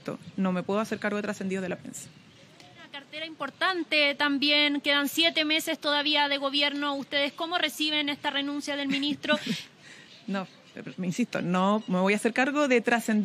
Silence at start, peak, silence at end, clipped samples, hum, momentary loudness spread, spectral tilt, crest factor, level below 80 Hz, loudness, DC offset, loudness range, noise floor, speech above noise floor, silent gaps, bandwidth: 0.05 s; -8 dBFS; 0 s; under 0.1%; none; 15 LU; -4 dB/octave; 20 dB; -78 dBFS; -26 LUFS; under 0.1%; 7 LU; -53 dBFS; 25 dB; none; 15.5 kHz